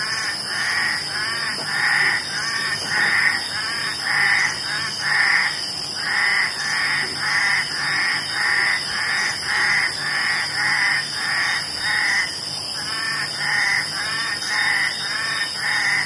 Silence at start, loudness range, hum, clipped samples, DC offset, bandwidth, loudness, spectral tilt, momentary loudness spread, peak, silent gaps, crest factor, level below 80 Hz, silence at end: 0 s; 2 LU; none; under 0.1%; under 0.1%; 11.5 kHz; -19 LUFS; -0.5 dB/octave; 6 LU; -4 dBFS; none; 18 dB; -60 dBFS; 0 s